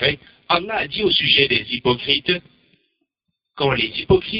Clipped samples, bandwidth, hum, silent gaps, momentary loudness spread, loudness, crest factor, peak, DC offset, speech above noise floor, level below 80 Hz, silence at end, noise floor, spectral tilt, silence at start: under 0.1%; 5.6 kHz; none; none; 9 LU; -18 LUFS; 18 dB; -2 dBFS; under 0.1%; 59 dB; -46 dBFS; 0 s; -78 dBFS; -9.5 dB/octave; 0 s